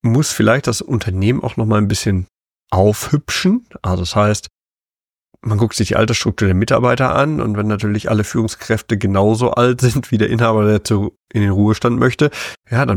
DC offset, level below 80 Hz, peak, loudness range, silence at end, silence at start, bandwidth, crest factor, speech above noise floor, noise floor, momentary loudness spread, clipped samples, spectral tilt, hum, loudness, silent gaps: under 0.1%; -40 dBFS; -2 dBFS; 3 LU; 0 s; 0.05 s; 17.5 kHz; 14 dB; over 75 dB; under -90 dBFS; 6 LU; under 0.1%; -6 dB/octave; none; -16 LUFS; 4.74-4.78 s